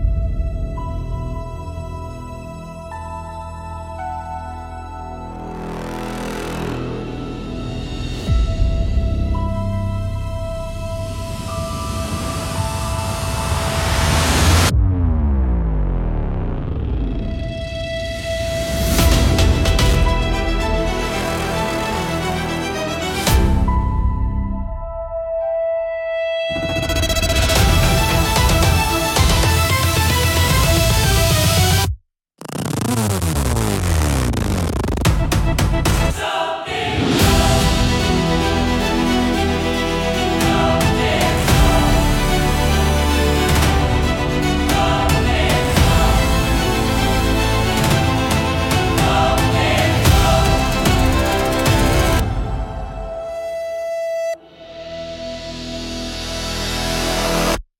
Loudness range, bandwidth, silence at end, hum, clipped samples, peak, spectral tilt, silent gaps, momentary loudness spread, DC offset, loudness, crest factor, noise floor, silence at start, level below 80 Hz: 11 LU; 17 kHz; 0.2 s; none; under 0.1%; -2 dBFS; -4.5 dB/octave; none; 13 LU; under 0.1%; -18 LUFS; 16 dB; -43 dBFS; 0 s; -22 dBFS